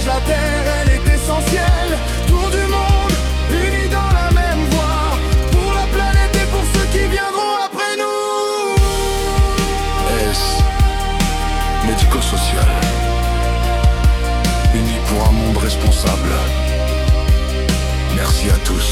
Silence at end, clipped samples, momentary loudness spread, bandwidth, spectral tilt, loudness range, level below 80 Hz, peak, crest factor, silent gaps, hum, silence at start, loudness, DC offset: 0 s; under 0.1%; 3 LU; 16 kHz; -5 dB/octave; 1 LU; -16 dBFS; -2 dBFS; 12 dB; none; none; 0 s; -16 LUFS; under 0.1%